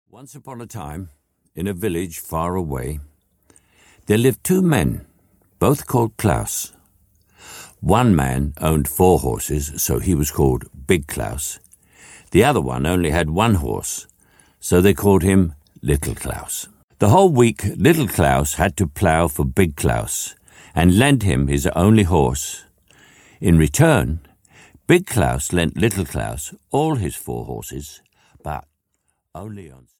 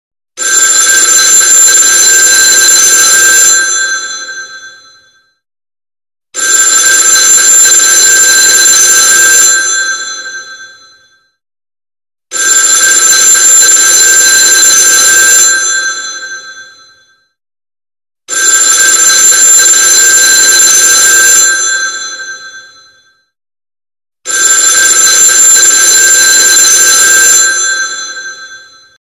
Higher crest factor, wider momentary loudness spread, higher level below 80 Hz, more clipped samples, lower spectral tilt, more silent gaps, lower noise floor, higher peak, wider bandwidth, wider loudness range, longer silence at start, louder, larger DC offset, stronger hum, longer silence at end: first, 18 dB vs 6 dB; about the same, 18 LU vs 16 LU; first, -34 dBFS vs -52 dBFS; second, under 0.1% vs 3%; first, -5.5 dB/octave vs 3.5 dB/octave; first, 16.84-16.88 s vs none; first, -71 dBFS vs -47 dBFS; about the same, -2 dBFS vs 0 dBFS; first, 18.5 kHz vs 16 kHz; about the same, 6 LU vs 8 LU; second, 0.2 s vs 0.35 s; second, -19 LUFS vs -2 LUFS; neither; neither; second, 0.3 s vs 0.45 s